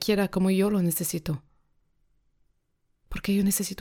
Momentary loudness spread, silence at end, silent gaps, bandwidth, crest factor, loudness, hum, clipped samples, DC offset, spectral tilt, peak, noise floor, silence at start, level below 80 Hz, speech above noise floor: 11 LU; 0.05 s; none; 17.5 kHz; 18 dB; -26 LUFS; none; under 0.1%; under 0.1%; -5 dB/octave; -10 dBFS; -72 dBFS; 0 s; -50 dBFS; 47 dB